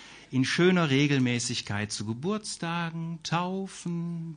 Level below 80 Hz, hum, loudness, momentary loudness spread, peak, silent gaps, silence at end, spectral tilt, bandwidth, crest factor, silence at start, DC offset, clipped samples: -62 dBFS; none; -28 LUFS; 11 LU; -12 dBFS; none; 0 s; -5 dB/octave; 10 kHz; 16 dB; 0 s; under 0.1%; under 0.1%